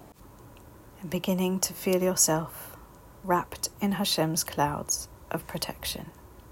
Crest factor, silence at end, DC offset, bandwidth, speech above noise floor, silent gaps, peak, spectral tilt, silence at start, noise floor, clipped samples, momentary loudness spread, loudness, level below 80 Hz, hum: 20 dB; 0 s; under 0.1%; 16.5 kHz; 22 dB; none; -10 dBFS; -3.5 dB/octave; 0 s; -50 dBFS; under 0.1%; 16 LU; -28 LUFS; -54 dBFS; none